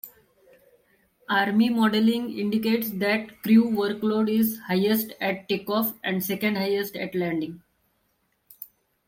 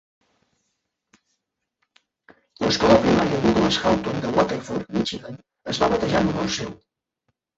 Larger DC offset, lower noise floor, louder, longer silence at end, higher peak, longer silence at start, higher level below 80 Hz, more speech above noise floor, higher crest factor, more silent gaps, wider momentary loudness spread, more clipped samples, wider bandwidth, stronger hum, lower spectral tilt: neither; second, -71 dBFS vs -78 dBFS; second, -24 LUFS vs -21 LUFS; second, 0.4 s vs 0.85 s; second, -8 dBFS vs -2 dBFS; second, 0.05 s vs 2.6 s; second, -68 dBFS vs -46 dBFS; second, 47 dB vs 56 dB; second, 16 dB vs 22 dB; neither; second, 9 LU vs 13 LU; neither; first, 16.5 kHz vs 8 kHz; neither; about the same, -5.5 dB/octave vs -5 dB/octave